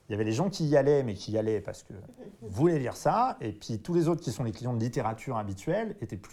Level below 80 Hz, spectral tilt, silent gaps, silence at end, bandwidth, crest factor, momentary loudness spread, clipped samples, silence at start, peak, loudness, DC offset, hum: -58 dBFS; -7 dB/octave; none; 0.05 s; 14 kHz; 18 dB; 15 LU; under 0.1%; 0.1 s; -12 dBFS; -29 LUFS; under 0.1%; none